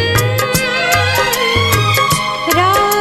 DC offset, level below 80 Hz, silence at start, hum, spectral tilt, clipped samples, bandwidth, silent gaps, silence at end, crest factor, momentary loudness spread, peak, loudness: under 0.1%; -34 dBFS; 0 s; none; -3.5 dB/octave; under 0.1%; 16.5 kHz; none; 0 s; 12 dB; 2 LU; 0 dBFS; -12 LUFS